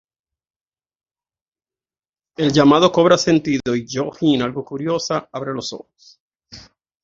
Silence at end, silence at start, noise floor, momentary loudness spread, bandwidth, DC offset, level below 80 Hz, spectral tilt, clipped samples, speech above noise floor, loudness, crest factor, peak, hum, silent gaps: 0.45 s; 2.4 s; under -90 dBFS; 14 LU; 7.6 kHz; under 0.1%; -56 dBFS; -5.5 dB/octave; under 0.1%; over 73 dB; -18 LUFS; 20 dB; 0 dBFS; none; 6.20-6.39 s